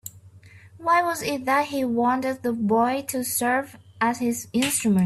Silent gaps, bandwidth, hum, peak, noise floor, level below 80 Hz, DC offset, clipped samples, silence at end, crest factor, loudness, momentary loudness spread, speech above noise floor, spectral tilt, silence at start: none; 15.5 kHz; none; -8 dBFS; -48 dBFS; -64 dBFS; under 0.1%; under 0.1%; 0 s; 14 dB; -23 LUFS; 5 LU; 25 dB; -4 dB/octave; 0.05 s